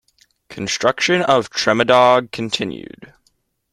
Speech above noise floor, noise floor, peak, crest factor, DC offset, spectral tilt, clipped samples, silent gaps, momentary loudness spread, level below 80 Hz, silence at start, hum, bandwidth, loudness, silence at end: 48 dB; -64 dBFS; 0 dBFS; 18 dB; under 0.1%; -3.5 dB/octave; under 0.1%; none; 13 LU; -56 dBFS; 0.5 s; none; 13 kHz; -16 LUFS; 0.65 s